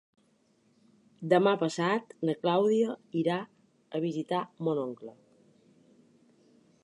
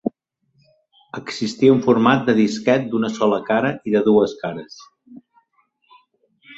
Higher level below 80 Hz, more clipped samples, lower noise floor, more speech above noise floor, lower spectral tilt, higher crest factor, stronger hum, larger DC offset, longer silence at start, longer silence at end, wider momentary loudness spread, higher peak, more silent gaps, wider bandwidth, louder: second, -84 dBFS vs -60 dBFS; neither; about the same, -68 dBFS vs -65 dBFS; second, 39 dB vs 47 dB; about the same, -6.5 dB/octave vs -6 dB/octave; about the same, 22 dB vs 18 dB; neither; neither; first, 1.2 s vs 0.05 s; first, 1.7 s vs 0.05 s; about the same, 14 LU vs 15 LU; second, -10 dBFS vs -2 dBFS; neither; first, 11 kHz vs 8 kHz; second, -30 LUFS vs -18 LUFS